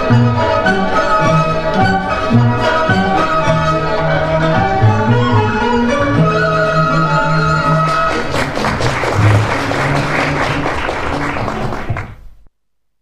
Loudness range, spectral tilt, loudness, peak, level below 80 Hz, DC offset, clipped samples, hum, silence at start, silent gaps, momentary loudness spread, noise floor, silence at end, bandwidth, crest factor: 3 LU; -6.5 dB/octave; -14 LUFS; 0 dBFS; -30 dBFS; under 0.1%; under 0.1%; none; 0 s; none; 6 LU; -70 dBFS; 0.7 s; 12 kHz; 14 dB